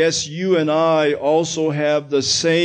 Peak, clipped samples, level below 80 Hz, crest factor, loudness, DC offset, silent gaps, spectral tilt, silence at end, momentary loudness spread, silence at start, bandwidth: -4 dBFS; under 0.1%; -58 dBFS; 12 dB; -18 LUFS; under 0.1%; none; -4 dB/octave; 0 s; 3 LU; 0 s; 9.6 kHz